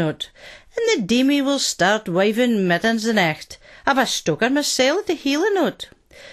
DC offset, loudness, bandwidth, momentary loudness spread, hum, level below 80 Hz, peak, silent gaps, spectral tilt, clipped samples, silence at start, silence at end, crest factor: under 0.1%; -19 LUFS; 13 kHz; 14 LU; none; -56 dBFS; -4 dBFS; none; -3.5 dB/octave; under 0.1%; 0 s; 0 s; 16 dB